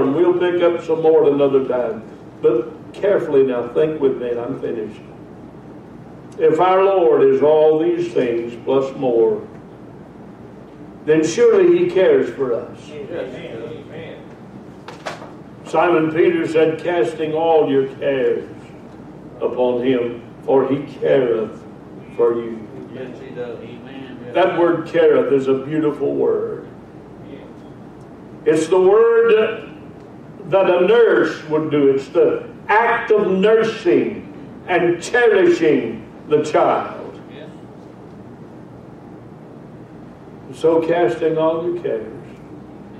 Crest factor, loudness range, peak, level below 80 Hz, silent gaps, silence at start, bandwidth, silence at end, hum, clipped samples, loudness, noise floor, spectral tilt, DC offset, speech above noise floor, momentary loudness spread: 14 dB; 7 LU; -4 dBFS; -56 dBFS; none; 0 s; 9.4 kHz; 0 s; none; under 0.1%; -17 LUFS; -38 dBFS; -6.5 dB/octave; under 0.1%; 22 dB; 25 LU